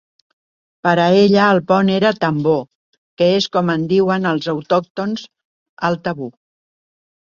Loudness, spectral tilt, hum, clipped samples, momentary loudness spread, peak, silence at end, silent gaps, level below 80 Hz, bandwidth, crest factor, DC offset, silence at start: -16 LUFS; -6.5 dB/octave; none; under 0.1%; 11 LU; -2 dBFS; 1.1 s; 2.75-3.17 s, 4.90-4.95 s, 5.45-5.77 s; -58 dBFS; 7.2 kHz; 16 dB; under 0.1%; 0.85 s